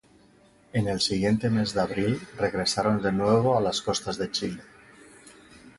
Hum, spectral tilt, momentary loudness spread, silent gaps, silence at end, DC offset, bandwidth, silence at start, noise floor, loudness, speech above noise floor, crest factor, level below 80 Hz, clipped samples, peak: none; -5 dB/octave; 7 LU; none; 0.1 s; under 0.1%; 11.5 kHz; 0.75 s; -58 dBFS; -26 LUFS; 32 dB; 18 dB; -54 dBFS; under 0.1%; -8 dBFS